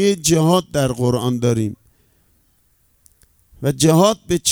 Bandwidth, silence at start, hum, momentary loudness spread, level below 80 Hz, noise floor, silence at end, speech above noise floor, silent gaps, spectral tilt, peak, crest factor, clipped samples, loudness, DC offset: 19.5 kHz; 0 s; none; 9 LU; -46 dBFS; -60 dBFS; 0 s; 43 dB; none; -5 dB/octave; 0 dBFS; 18 dB; under 0.1%; -17 LUFS; under 0.1%